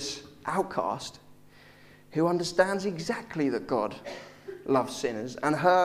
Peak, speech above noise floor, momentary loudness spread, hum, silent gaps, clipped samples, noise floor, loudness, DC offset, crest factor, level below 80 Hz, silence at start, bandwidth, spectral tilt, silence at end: -8 dBFS; 26 dB; 15 LU; none; none; under 0.1%; -54 dBFS; -29 LUFS; under 0.1%; 22 dB; -62 dBFS; 0 s; 15.5 kHz; -5 dB/octave; 0 s